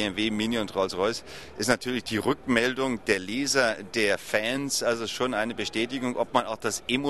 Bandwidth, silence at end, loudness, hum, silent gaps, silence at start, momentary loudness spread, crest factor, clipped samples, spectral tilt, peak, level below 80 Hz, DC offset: 13 kHz; 0 s; -27 LUFS; none; none; 0 s; 5 LU; 24 dB; under 0.1%; -3 dB/octave; -4 dBFS; -56 dBFS; 0.3%